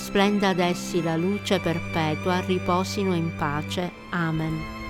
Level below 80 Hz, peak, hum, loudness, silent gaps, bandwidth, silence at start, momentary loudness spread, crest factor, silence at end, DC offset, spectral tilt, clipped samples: -48 dBFS; -8 dBFS; none; -25 LUFS; none; 16.5 kHz; 0 s; 6 LU; 16 dB; 0 s; under 0.1%; -5.5 dB/octave; under 0.1%